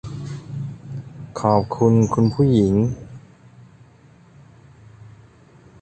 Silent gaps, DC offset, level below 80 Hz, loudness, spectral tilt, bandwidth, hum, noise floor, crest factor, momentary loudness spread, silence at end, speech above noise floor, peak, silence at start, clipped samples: none; under 0.1%; -46 dBFS; -19 LUFS; -8.5 dB/octave; 8.8 kHz; none; -50 dBFS; 20 dB; 18 LU; 0.75 s; 33 dB; -2 dBFS; 0.05 s; under 0.1%